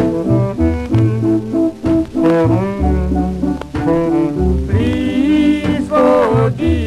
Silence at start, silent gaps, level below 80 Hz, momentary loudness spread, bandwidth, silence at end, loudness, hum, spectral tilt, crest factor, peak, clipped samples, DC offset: 0 s; none; -26 dBFS; 5 LU; 11.5 kHz; 0 s; -15 LUFS; none; -8.5 dB/octave; 14 dB; 0 dBFS; under 0.1%; under 0.1%